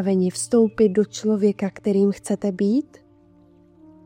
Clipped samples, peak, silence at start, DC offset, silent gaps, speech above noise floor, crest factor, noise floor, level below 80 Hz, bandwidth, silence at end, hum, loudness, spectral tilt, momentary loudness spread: under 0.1%; -6 dBFS; 0 s; under 0.1%; none; 33 dB; 14 dB; -53 dBFS; -60 dBFS; 15.5 kHz; 1.25 s; none; -21 LUFS; -6.5 dB/octave; 6 LU